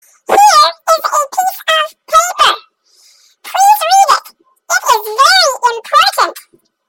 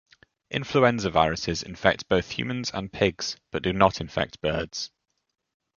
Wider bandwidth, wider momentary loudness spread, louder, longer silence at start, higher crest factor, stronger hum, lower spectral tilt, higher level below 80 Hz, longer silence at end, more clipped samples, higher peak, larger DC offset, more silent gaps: first, 17.5 kHz vs 7.4 kHz; second, 8 LU vs 11 LU; first, -10 LUFS vs -26 LUFS; second, 0.3 s vs 0.5 s; second, 12 dB vs 24 dB; neither; second, 1.5 dB/octave vs -4.5 dB/octave; second, -56 dBFS vs -48 dBFS; second, 0.5 s vs 0.9 s; neither; about the same, 0 dBFS vs -2 dBFS; neither; neither